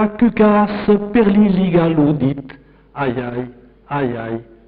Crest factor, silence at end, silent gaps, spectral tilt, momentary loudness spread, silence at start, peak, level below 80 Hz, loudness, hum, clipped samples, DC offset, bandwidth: 12 dB; 0.25 s; none; -7 dB/octave; 14 LU; 0 s; -4 dBFS; -42 dBFS; -16 LUFS; none; under 0.1%; under 0.1%; 4.7 kHz